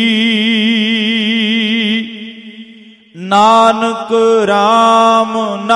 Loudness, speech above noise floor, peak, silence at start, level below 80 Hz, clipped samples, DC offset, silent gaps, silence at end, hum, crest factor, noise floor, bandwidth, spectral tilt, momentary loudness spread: -11 LUFS; 29 dB; 0 dBFS; 0 s; -60 dBFS; under 0.1%; under 0.1%; none; 0 s; none; 12 dB; -39 dBFS; 11.5 kHz; -4.5 dB/octave; 11 LU